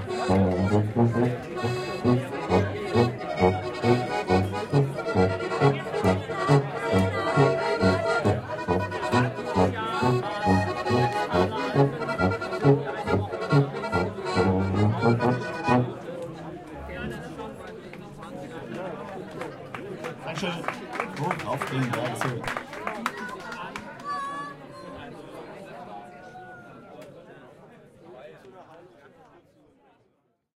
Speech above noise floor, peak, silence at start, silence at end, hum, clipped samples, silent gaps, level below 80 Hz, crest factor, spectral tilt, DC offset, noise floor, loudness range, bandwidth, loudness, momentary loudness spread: 47 dB; -6 dBFS; 0 s; 1.7 s; none; under 0.1%; none; -54 dBFS; 22 dB; -7 dB/octave; under 0.1%; -70 dBFS; 14 LU; 13.5 kHz; -26 LUFS; 18 LU